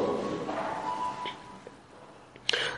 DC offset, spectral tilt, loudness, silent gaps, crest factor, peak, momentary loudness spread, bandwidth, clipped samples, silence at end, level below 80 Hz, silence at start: under 0.1%; -3.5 dB/octave; -33 LUFS; none; 26 dB; -8 dBFS; 21 LU; 11.5 kHz; under 0.1%; 0 s; -66 dBFS; 0 s